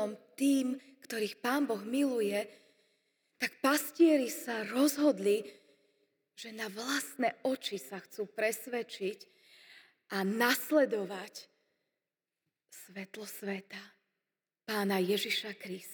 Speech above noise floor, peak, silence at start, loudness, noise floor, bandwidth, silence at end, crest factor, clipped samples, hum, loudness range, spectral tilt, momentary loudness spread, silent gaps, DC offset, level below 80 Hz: over 57 dB; -16 dBFS; 0 s; -33 LUFS; under -90 dBFS; over 20 kHz; 0 s; 20 dB; under 0.1%; none; 8 LU; -4 dB/octave; 18 LU; none; under 0.1%; under -90 dBFS